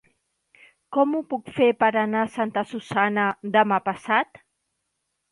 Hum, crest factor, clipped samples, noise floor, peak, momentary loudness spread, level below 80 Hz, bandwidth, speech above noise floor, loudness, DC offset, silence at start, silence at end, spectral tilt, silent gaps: none; 20 dB; under 0.1%; -77 dBFS; -4 dBFS; 8 LU; -68 dBFS; 11.5 kHz; 55 dB; -23 LUFS; under 0.1%; 0.9 s; 1.05 s; -6 dB/octave; none